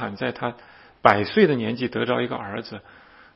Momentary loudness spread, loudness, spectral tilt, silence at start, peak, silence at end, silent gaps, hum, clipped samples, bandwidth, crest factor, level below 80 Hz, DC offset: 14 LU; -22 LUFS; -8 dB/octave; 0 s; 0 dBFS; 0.55 s; none; none; under 0.1%; 6.2 kHz; 24 dB; -60 dBFS; under 0.1%